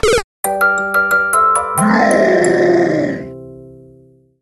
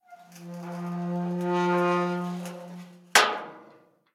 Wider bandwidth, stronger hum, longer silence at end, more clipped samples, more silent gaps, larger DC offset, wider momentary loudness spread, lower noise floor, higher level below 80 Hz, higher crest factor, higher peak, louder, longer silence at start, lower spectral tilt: second, 13.5 kHz vs 16.5 kHz; neither; first, 0.65 s vs 0.45 s; neither; first, 0.24-0.43 s vs none; neither; second, 10 LU vs 22 LU; second, -47 dBFS vs -57 dBFS; first, -38 dBFS vs -84 dBFS; second, 14 dB vs 26 dB; about the same, -2 dBFS vs -2 dBFS; first, -13 LUFS vs -26 LUFS; about the same, 0.05 s vs 0.1 s; about the same, -4.5 dB/octave vs -4 dB/octave